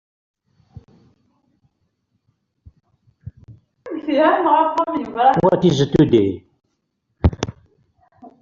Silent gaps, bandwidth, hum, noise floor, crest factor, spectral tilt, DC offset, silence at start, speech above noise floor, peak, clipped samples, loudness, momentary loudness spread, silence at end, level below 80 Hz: none; 7.4 kHz; none; -72 dBFS; 18 dB; -6 dB/octave; under 0.1%; 3.25 s; 56 dB; -2 dBFS; under 0.1%; -17 LUFS; 16 LU; 0.15 s; -40 dBFS